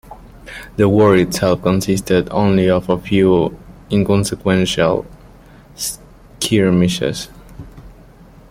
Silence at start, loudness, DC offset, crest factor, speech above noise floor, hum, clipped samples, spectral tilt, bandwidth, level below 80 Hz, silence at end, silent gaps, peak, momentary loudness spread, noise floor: 0.1 s; -16 LUFS; under 0.1%; 16 dB; 28 dB; none; under 0.1%; -5.5 dB/octave; 16 kHz; -40 dBFS; 0.6 s; none; -2 dBFS; 14 LU; -42 dBFS